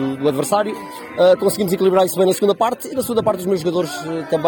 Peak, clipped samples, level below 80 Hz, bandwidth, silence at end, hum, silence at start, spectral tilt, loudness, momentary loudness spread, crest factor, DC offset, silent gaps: -2 dBFS; under 0.1%; -56 dBFS; 19 kHz; 0 s; none; 0 s; -5 dB/octave; -18 LUFS; 9 LU; 16 dB; under 0.1%; none